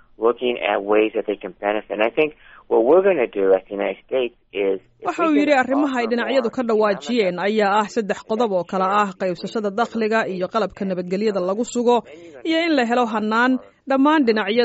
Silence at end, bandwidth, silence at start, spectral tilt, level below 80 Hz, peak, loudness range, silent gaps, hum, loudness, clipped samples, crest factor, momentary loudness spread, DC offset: 0 s; 8 kHz; 0.2 s; -3.5 dB/octave; -60 dBFS; -4 dBFS; 3 LU; none; none; -20 LUFS; under 0.1%; 16 dB; 8 LU; under 0.1%